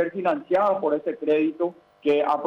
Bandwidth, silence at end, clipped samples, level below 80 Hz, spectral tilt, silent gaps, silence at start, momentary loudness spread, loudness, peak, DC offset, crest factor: 6.2 kHz; 0 s; under 0.1%; -72 dBFS; -7.5 dB/octave; none; 0 s; 7 LU; -24 LUFS; -12 dBFS; under 0.1%; 12 dB